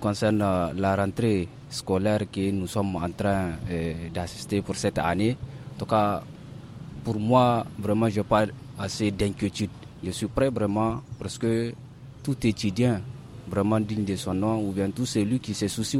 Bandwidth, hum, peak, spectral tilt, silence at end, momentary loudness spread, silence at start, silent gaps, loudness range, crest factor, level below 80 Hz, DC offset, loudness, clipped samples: 16 kHz; none; -8 dBFS; -6 dB/octave; 0 s; 11 LU; 0 s; none; 3 LU; 18 dB; -48 dBFS; under 0.1%; -27 LUFS; under 0.1%